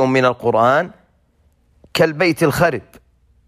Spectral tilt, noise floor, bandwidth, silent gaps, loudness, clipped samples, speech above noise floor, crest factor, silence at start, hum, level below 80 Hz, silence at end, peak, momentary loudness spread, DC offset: -5.5 dB/octave; -58 dBFS; 15.5 kHz; none; -16 LUFS; under 0.1%; 42 dB; 14 dB; 0 s; none; -50 dBFS; 0.65 s; -4 dBFS; 10 LU; under 0.1%